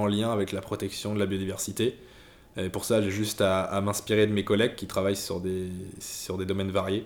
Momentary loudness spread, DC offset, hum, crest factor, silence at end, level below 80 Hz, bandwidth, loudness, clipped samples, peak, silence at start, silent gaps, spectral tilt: 10 LU; under 0.1%; none; 18 dB; 0 s; -58 dBFS; over 20 kHz; -28 LUFS; under 0.1%; -10 dBFS; 0 s; none; -5 dB/octave